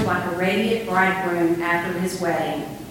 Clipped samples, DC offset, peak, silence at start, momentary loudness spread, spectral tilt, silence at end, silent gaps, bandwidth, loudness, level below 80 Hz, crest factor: under 0.1%; under 0.1%; -6 dBFS; 0 s; 5 LU; -5.5 dB/octave; 0 s; none; 17 kHz; -22 LUFS; -52 dBFS; 16 dB